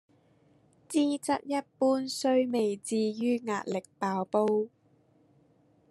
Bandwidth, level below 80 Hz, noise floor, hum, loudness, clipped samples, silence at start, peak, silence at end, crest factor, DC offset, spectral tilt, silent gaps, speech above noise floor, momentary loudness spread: 13 kHz; -82 dBFS; -65 dBFS; none; -30 LUFS; under 0.1%; 0.9 s; -14 dBFS; 1.25 s; 18 dB; under 0.1%; -5 dB/octave; none; 36 dB; 6 LU